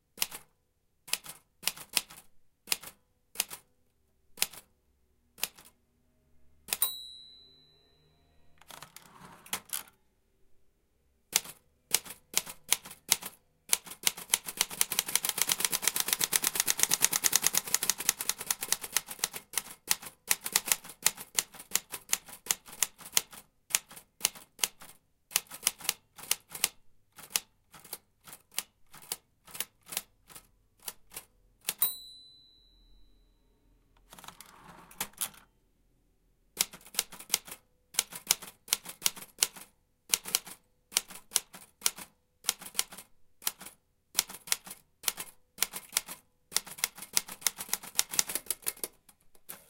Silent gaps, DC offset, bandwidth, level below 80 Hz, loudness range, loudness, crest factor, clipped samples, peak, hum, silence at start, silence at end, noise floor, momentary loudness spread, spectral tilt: none; under 0.1%; 17 kHz; -68 dBFS; 13 LU; -31 LUFS; 36 dB; under 0.1%; -2 dBFS; none; 0.15 s; 0.1 s; -74 dBFS; 21 LU; 1.5 dB/octave